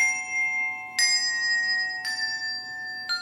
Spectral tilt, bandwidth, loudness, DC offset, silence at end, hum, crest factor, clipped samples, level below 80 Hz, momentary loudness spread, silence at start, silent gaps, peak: 3 dB/octave; 16.5 kHz; -24 LUFS; under 0.1%; 0 s; none; 16 dB; under 0.1%; -72 dBFS; 10 LU; 0 s; none; -10 dBFS